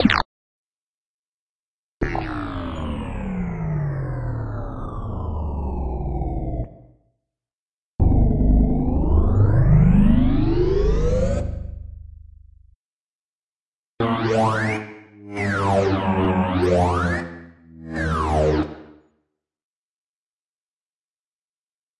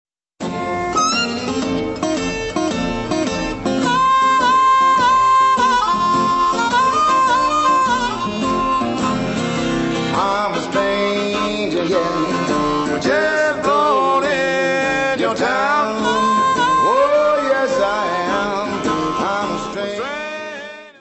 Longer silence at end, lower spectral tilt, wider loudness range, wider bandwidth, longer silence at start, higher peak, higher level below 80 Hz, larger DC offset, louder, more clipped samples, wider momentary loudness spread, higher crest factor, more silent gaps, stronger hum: first, 3.05 s vs 0.1 s; first, -8 dB/octave vs -4 dB/octave; first, 11 LU vs 5 LU; first, 11 kHz vs 8.4 kHz; second, 0 s vs 0.4 s; first, 0 dBFS vs -4 dBFS; first, -28 dBFS vs -44 dBFS; neither; second, -22 LUFS vs -17 LUFS; neither; first, 14 LU vs 8 LU; first, 22 dB vs 14 dB; first, 0.25-2.00 s, 7.53-7.99 s, 12.76-13.97 s vs none; neither